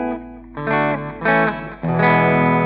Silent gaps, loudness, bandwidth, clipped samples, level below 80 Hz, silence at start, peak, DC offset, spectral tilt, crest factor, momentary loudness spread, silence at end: none; -18 LUFS; 5 kHz; under 0.1%; -44 dBFS; 0 s; -2 dBFS; under 0.1%; -5.5 dB/octave; 16 dB; 13 LU; 0 s